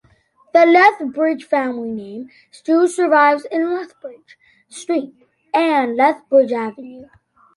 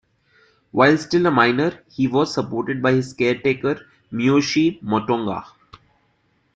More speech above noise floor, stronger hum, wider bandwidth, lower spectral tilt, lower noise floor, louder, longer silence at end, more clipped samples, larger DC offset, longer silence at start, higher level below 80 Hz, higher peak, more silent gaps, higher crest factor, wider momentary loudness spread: second, 39 dB vs 45 dB; neither; first, 11.5 kHz vs 8.8 kHz; second, -4 dB/octave vs -6 dB/octave; second, -55 dBFS vs -64 dBFS; first, -16 LUFS vs -20 LUFS; second, 0.5 s vs 1.1 s; neither; neither; second, 0.55 s vs 0.75 s; second, -68 dBFS vs -58 dBFS; about the same, -2 dBFS vs -2 dBFS; neither; about the same, 16 dB vs 18 dB; first, 22 LU vs 9 LU